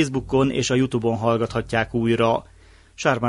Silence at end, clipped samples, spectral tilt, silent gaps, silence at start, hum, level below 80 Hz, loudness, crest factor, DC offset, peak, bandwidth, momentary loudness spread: 0 s; under 0.1%; -5.5 dB/octave; none; 0 s; none; -44 dBFS; -22 LUFS; 18 dB; under 0.1%; -4 dBFS; 11.5 kHz; 3 LU